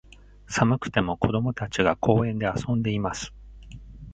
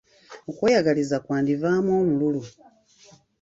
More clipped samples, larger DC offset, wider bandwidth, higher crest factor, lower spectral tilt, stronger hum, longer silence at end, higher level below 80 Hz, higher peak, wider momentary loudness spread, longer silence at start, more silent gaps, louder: neither; neither; first, 9 kHz vs 8 kHz; about the same, 22 dB vs 18 dB; about the same, -6 dB/octave vs -6.5 dB/octave; neither; second, 0 s vs 0.9 s; first, -46 dBFS vs -62 dBFS; about the same, -4 dBFS vs -6 dBFS; first, 19 LU vs 16 LU; first, 0.5 s vs 0.3 s; neither; about the same, -25 LUFS vs -23 LUFS